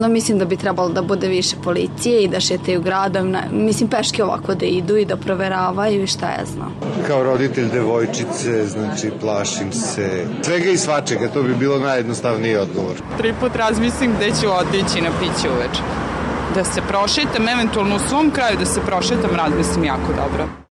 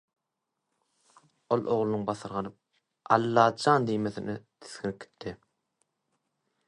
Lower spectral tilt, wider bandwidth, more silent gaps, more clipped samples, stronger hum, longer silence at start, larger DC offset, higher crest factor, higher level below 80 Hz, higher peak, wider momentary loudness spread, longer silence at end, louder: second, -4.5 dB/octave vs -6 dB/octave; first, 13 kHz vs 11 kHz; neither; neither; neither; second, 0 s vs 1.5 s; neither; second, 14 dB vs 26 dB; first, -38 dBFS vs -68 dBFS; about the same, -4 dBFS vs -6 dBFS; second, 5 LU vs 18 LU; second, 0.1 s vs 1.35 s; first, -18 LUFS vs -28 LUFS